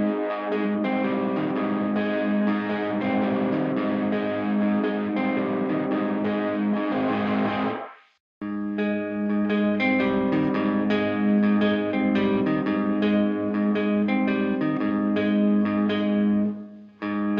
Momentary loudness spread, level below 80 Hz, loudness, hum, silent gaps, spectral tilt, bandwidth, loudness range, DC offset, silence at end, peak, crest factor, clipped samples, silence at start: 5 LU; -60 dBFS; -24 LUFS; none; 8.20-8.41 s; -9 dB/octave; 5.2 kHz; 3 LU; under 0.1%; 0 s; -12 dBFS; 12 dB; under 0.1%; 0 s